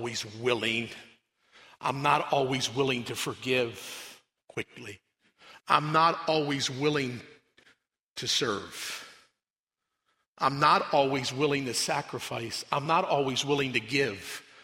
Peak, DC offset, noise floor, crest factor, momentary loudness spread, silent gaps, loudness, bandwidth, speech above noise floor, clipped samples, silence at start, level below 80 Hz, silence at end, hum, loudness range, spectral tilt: -6 dBFS; under 0.1%; under -90 dBFS; 24 dB; 16 LU; 8.02-8.16 s, 9.50-9.67 s, 10.27-10.35 s; -28 LUFS; 16 kHz; over 61 dB; under 0.1%; 0 s; -70 dBFS; 0.2 s; none; 5 LU; -3.5 dB/octave